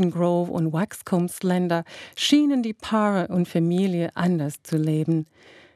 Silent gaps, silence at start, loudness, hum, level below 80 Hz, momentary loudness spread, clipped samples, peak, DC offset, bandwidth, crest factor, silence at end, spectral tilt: none; 0 s; -23 LUFS; none; -66 dBFS; 7 LU; under 0.1%; -6 dBFS; under 0.1%; 13.5 kHz; 16 dB; 0.5 s; -6 dB/octave